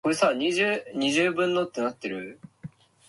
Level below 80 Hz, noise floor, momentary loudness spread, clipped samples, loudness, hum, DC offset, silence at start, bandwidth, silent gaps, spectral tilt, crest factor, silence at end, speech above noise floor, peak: -68 dBFS; -46 dBFS; 21 LU; under 0.1%; -25 LUFS; none; under 0.1%; 0.05 s; 12 kHz; none; -4 dB/octave; 16 dB; 0.4 s; 20 dB; -10 dBFS